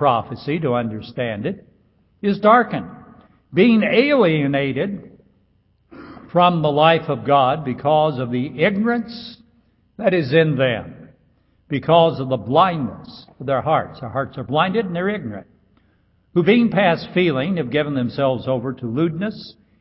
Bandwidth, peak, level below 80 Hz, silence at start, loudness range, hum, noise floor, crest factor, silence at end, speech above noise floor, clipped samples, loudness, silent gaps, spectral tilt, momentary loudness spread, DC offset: 5.8 kHz; 0 dBFS; -54 dBFS; 0 s; 3 LU; none; -61 dBFS; 18 dB; 0.3 s; 42 dB; under 0.1%; -19 LUFS; none; -11.5 dB/octave; 13 LU; under 0.1%